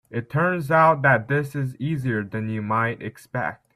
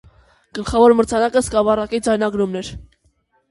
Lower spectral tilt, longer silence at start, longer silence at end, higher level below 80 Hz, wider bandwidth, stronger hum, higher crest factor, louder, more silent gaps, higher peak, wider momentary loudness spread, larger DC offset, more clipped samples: first, -8 dB/octave vs -5 dB/octave; second, 0.1 s vs 0.55 s; second, 0.2 s vs 0.7 s; second, -60 dBFS vs -40 dBFS; first, 14 kHz vs 11.5 kHz; neither; about the same, 18 dB vs 16 dB; second, -22 LUFS vs -17 LUFS; neither; about the same, -4 dBFS vs -2 dBFS; second, 11 LU vs 16 LU; neither; neither